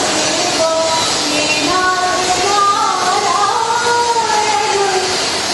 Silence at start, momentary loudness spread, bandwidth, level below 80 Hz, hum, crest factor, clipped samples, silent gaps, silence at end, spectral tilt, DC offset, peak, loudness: 0 s; 2 LU; 12 kHz; -48 dBFS; none; 12 dB; under 0.1%; none; 0 s; -1 dB/octave; under 0.1%; -2 dBFS; -13 LUFS